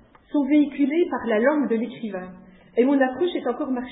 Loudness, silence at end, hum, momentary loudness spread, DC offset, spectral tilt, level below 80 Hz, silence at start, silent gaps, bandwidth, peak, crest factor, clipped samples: -23 LUFS; 0 s; none; 12 LU; under 0.1%; -10.5 dB/octave; -62 dBFS; 0.35 s; none; 4 kHz; -6 dBFS; 16 dB; under 0.1%